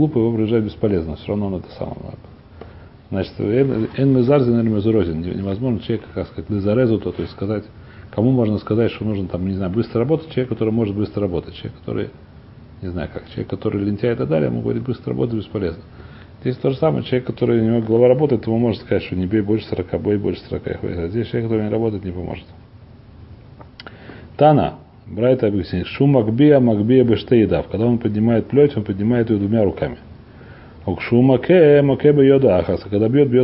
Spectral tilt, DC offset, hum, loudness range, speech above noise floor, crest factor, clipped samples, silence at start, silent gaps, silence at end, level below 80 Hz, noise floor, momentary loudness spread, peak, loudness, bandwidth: -13 dB/octave; under 0.1%; none; 8 LU; 25 dB; 18 dB; under 0.1%; 0 s; none; 0 s; -40 dBFS; -43 dBFS; 14 LU; 0 dBFS; -18 LUFS; 5.8 kHz